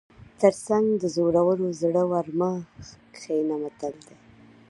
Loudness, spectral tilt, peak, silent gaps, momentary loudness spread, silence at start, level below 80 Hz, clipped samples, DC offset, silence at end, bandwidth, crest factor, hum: -25 LUFS; -7 dB/octave; -4 dBFS; none; 14 LU; 0.2 s; -62 dBFS; under 0.1%; under 0.1%; 0.75 s; 11.5 kHz; 20 dB; none